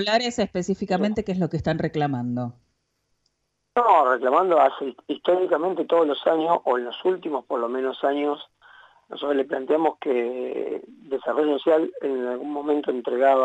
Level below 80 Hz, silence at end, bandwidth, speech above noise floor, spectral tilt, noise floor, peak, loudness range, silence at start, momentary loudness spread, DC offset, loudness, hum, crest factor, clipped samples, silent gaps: -58 dBFS; 0 s; 8.2 kHz; 50 dB; -6 dB/octave; -73 dBFS; -6 dBFS; 5 LU; 0 s; 10 LU; under 0.1%; -23 LUFS; 50 Hz at -65 dBFS; 18 dB; under 0.1%; none